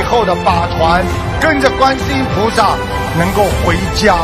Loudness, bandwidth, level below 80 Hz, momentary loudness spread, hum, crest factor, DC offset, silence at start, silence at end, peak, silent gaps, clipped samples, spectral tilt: -13 LUFS; 15 kHz; -24 dBFS; 4 LU; none; 12 dB; under 0.1%; 0 s; 0 s; 0 dBFS; none; under 0.1%; -5 dB/octave